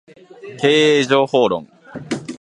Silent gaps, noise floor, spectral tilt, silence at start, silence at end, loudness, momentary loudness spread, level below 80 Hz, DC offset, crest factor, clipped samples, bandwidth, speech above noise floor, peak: none; -38 dBFS; -4.5 dB/octave; 0.45 s; 0.05 s; -16 LUFS; 22 LU; -62 dBFS; under 0.1%; 18 dB; under 0.1%; 11 kHz; 23 dB; 0 dBFS